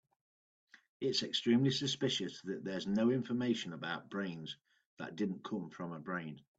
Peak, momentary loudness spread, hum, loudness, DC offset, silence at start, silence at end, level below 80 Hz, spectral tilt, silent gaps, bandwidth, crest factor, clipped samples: -20 dBFS; 13 LU; none; -37 LUFS; under 0.1%; 0.75 s; 0.2 s; -78 dBFS; -5 dB/octave; 0.89-1.00 s, 4.86-4.97 s; 8 kHz; 18 dB; under 0.1%